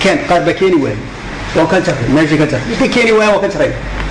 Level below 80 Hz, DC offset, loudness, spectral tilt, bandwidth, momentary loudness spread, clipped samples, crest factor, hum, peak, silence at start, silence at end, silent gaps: -30 dBFS; under 0.1%; -12 LUFS; -5.5 dB/octave; 10.5 kHz; 10 LU; under 0.1%; 8 dB; none; -4 dBFS; 0 s; 0 s; none